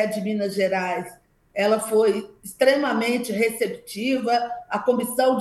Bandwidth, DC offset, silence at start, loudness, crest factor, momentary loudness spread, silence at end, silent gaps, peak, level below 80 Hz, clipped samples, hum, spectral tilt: 13 kHz; under 0.1%; 0 s; -23 LUFS; 18 dB; 9 LU; 0 s; none; -6 dBFS; -66 dBFS; under 0.1%; none; -4.5 dB/octave